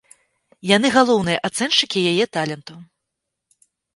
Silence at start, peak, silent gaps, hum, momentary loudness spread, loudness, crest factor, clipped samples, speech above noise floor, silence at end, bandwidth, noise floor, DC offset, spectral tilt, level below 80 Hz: 0.65 s; 0 dBFS; none; none; 12 LU; -18 LUFS; 20 dB; under 0.1%; 61 dB; 1.1 s; 11.5 kHz; -80 dBFS; under 0.1%; -4 dB/octave; -60 dBFS